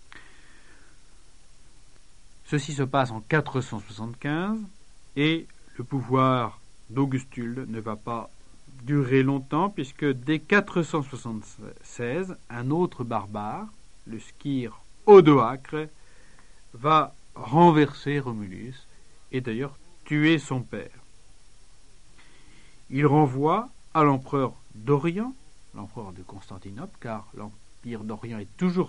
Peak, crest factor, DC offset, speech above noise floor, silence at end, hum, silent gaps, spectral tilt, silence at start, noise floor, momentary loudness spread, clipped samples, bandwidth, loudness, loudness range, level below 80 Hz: -2 dBFS; 24 dB; 0.5%; 29 dB; 0 s; none; none; -7 dB/octave; 0.15 s; -53 dBFS; 20 LU; under 0.1%; 10.5 kHz; -25 LUFS; 10 LU; -54 dBFS